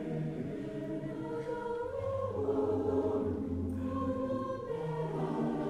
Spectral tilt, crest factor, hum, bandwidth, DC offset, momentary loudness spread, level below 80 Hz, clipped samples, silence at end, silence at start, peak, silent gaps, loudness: -9 dB/octave; 14 dB; none; 11.5 kHz; under 0.1%; 7 LU; -56 dBFS; under 0.1%; 0 s; 0 s; -20 dBFS; none; -36 LUFS